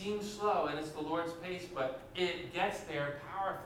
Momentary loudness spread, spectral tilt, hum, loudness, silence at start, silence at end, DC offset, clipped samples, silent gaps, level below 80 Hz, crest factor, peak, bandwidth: 6 LU; -4.5 dB/octave; none; -37 LUFS; 0 s; 0 s; under 0.1%; under 0.1%; none; -64 dBFS; 16 dB; -20 dBFS; 17 kHz